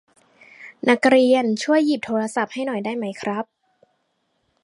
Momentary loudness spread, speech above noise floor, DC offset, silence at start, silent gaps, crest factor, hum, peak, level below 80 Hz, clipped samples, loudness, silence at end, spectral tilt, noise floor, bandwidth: 14 LU; 51 dB; under 0.1%; 0.6 s; none; 20 dB; none; -2 dBFS; -72 dBFS; under 0.1%; -20 LUFS; 1.2 s; -4.5 dB/octave; -70 dBFS; 11.5 kHz